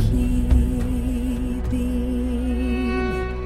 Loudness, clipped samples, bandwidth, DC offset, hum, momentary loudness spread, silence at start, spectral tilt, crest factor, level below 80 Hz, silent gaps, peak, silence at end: -23 LUFS; under 0.1%; 13.5 kHz; under 0.1%; none; 5 LU; 0 s; -7.5 dB/octave; 14 dB; -24 dBFS; none; -6 dBFS; 0 s